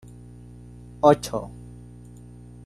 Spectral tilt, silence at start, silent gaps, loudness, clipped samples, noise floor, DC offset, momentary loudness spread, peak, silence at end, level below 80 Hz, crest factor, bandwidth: -6 dB/octave; 1.05 s; none; -22 LUFS; under 0.1%; -44 dBFS; under 0.1%; 26 LU; -2 dBFS; 1.15 s; -50 dBFS; 24 dB; 13 kHz